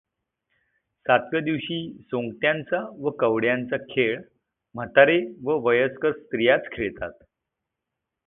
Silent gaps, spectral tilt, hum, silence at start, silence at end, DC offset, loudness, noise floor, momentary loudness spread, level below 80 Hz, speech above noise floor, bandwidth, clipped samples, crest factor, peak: none; -10 dB/octave; none; 1.05 s; 1.15 s; under 0.1%; -23 LUFS; -84 dBFS; 13 LU; -60 dBFS; 61 dB; 4 kHz; under 0.1%; 24 dB; -2 dBFS